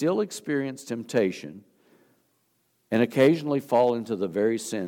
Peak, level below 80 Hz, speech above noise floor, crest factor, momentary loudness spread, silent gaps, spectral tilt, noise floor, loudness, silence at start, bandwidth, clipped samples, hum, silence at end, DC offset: -6 dBFS; -76 dBFS; 46 dB; 20 dB; 11 LU; none; -6 dB/octave; -70 dBFS; -25 LUFS; 0 s; 18 kHz; under 0.1%; none; 0 s; under 0.1%